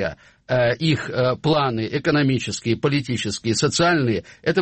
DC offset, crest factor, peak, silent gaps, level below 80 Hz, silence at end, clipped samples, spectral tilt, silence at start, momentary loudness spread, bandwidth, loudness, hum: under 0.1%; 14 dB; -6 dBFS; none; -50 dBFS; 0 s; under 0.1%; -5 dB/octave; 0 s; 6 LU; 8.8 kHz; -21 LUFS; none